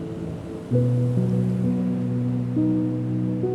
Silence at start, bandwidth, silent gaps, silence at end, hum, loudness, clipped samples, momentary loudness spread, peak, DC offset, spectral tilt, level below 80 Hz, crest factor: 0 s; 5.6 kHz; none; 0 s; none; -24 LUFS; under 0.1%; 9 LU; -10 dBFS; under 0.1%; -10 dB/octave; -50 dBFS; 12 dB